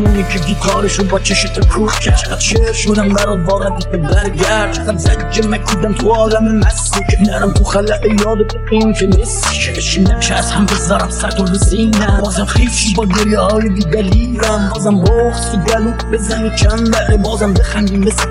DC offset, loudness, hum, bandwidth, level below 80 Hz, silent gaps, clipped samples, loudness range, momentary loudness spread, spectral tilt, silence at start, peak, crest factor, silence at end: under 0.1%; -13 LUFS; none; 14 kHz; -18 dBFS; none; under 0.1%; 1 LU; 3 LU; -5 dB/octave; 0 s; 0 dBFS; 12 dB; 0 s